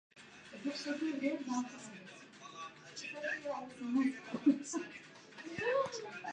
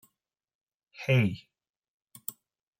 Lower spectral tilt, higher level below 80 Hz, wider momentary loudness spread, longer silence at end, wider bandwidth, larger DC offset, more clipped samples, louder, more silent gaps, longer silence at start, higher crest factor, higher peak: second, -4 dB/octave vs -6.5 dB/octave; second, -80 dBFS vs -72 dBFS; first, 18 LU vs 15 LU; second, 0 s vs 0.5 s; second, 9.6 kHz vs 16.5 kHz; neither; neither; second, -38 LUFS vs -30 LUFS; second, none vs 1.76-1.80 s, 1.88-2.07 s; second, 0.15 s vs 1 s; about the same, 20 dB vs 20 dB; second, -18 dBFS vs -14 dBFS